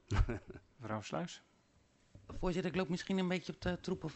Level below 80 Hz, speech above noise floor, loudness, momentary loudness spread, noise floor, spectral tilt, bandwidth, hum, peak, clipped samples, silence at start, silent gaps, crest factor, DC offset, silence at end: -46 dBFS; 32 dB; -39 LUFS; 15 LU; -71 dBFS; -6 dB/octave; 8.2 kHz; none; -20 dBFS; under 0.1%; 0.1 s; none; 20 dB; under 0.1%; 0 s